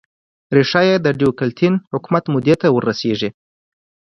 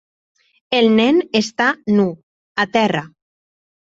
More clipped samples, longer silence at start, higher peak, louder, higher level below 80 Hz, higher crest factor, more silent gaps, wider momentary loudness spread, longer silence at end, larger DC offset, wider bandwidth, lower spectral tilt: neither; second, 0.5 s vs 0.7 s; about the same, 0 dBFS vs -2 dBFS; about the same, -17 LUFS vs -17 LUFS; about the same, -56 dBFS vs -60 dBFS; about the same, 16 dB vs 16 dB; second, 1.87-1.91 s vs 2.23-2.55 s; about the same, 7 LU vs 8 LU; about the same, 0.85 s vs 0.85 s; neither; first, 10 kHz vs 7.8 kHz; first, -7 dB/octave vs -5 dB/octave